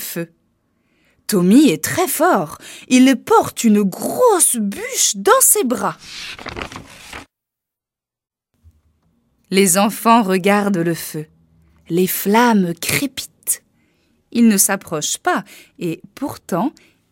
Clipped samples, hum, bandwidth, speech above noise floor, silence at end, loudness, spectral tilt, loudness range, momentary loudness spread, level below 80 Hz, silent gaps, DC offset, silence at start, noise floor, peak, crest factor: under 0.1%; none; 16.5 kHz; 72 dB; 0.4 s; -15 LUFS; -3.5 dB/octave; 7 LU; 17 LU; -56 dBFS; none; under 0.1%; 0 s; -87 dBFS; 0 dBFS; 18 dB